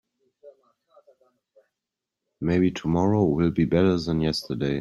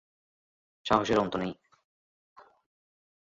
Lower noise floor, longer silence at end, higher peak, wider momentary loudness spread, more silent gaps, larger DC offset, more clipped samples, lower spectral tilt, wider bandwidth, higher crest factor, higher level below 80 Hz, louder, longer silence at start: about the same, -87 dBFS vs under -90 dBFS; second, 0 s vs 1.7 s; about the same, -8 dBFS vs -8 dBFS; second, 6 LU vs 16 LU; neither; neither; neither; first, -7.5 dB/octave vs -5.5 dB/octave; first, 12.5 kHz vs 8 kHz; second, 18 dB vs 26 dB; first, -50 dBFS vs -60 dBFS; first, -23 LUFS vs -28 LUFS; second, 0.45 s vs 0.85 s